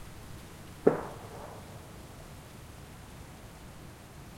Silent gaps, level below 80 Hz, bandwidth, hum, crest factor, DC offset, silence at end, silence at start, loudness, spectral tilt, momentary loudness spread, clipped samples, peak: none; -56 dBFS; 16.5 kHz; none; 32 dB; under 0.1%; 0 s; 0 s; -38 LUFS; -6 dB/octave; 20 LU; under 0.1%; -6 dBFS